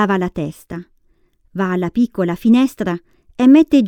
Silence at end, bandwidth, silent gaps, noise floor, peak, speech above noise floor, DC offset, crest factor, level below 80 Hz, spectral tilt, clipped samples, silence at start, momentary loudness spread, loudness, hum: 0 s; 15.5 kHz; none; -57 dBFS; 0 dBFS; 42 dB; under 0.1%; 16 dB; -48 dBFS; -7.5 dB/octave; under 0.1%; 0 s; 21 LU; -16 LUFS; none